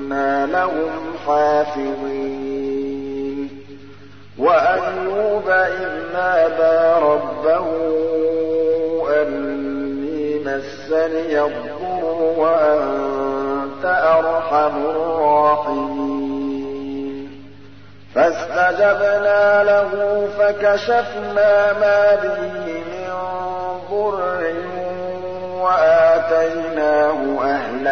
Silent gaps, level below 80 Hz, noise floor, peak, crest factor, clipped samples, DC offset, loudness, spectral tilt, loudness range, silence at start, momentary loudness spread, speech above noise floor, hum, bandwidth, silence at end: none; -56 dBFS; -43 dBFS; -4 dBFS; 14 dB; under 0.1%; 0.9%; -18 LUFS; -6 dB/octave; 5 LU; 0 s; 11 LU; 27 dB; 50 Hz at -45 dBFS; 6.4 kHz; 0 s